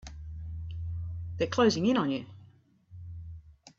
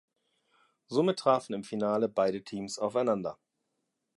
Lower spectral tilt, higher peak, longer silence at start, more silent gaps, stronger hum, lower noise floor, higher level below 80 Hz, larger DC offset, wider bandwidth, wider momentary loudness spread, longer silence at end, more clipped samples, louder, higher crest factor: about the same, -6 dB/octave vs -5.5 dB/octave; about the same, -12 dBFS vs -12 dBFS; second, 0.05 s vs 0.9 s; neither; neither; second, -59 dBFS vs -82 dBFS; first, -50 dBFS vs -74 dBFS; neither; second, 7.8 kHz vs 11.5 kHz; first, 23 LU vs 10 LU; second, 0.1 s vs 0.85 s; neither; about the same, -30 LUFS vs -30 LUFS; about the same, 20 dB vs 20 dB